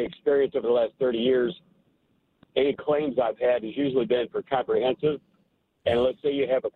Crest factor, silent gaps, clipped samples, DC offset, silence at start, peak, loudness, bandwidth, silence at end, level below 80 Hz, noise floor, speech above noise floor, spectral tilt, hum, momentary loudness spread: 16 dB; none; under 0.1%; under 0.1%; 0 s; -8 dBFS; -25 LUFS; 4.3 kHz; 0.05 s; -60 dBFS; -69 dBFS; 44 dB; -8 dB/octave; none; 5 LU